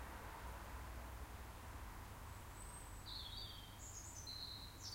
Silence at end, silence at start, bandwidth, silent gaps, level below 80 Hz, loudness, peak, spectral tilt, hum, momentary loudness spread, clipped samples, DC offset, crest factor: 0 s; 0 s; 16 kHz; none; -56 dBFS; -52 LUFS; -38 dBFS; -3 dB/octave; none; 5 LU; under 0.1%; under 0.1%; 14 dB